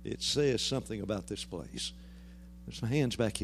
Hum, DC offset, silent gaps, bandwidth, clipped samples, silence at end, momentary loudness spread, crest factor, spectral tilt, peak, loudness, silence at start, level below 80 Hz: none; under 0.1%; none; 15.5 kHz; under 0.1%; 0 s; 22 LU; 18 dB; -4.5 dB/octave; -16 dBFS; -33 LUFS; 0 s; -52 dBFS